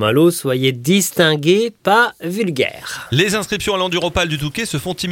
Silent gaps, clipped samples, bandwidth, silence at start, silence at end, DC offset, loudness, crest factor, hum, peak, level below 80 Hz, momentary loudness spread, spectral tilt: none; under 0.1%; 17 kHz; 0 s; 0 s; under 0.1%; -16 LUFS; 16 dB; none; 0 dBFS; -44 dBFS; 7 LU; -4.5 dB/octave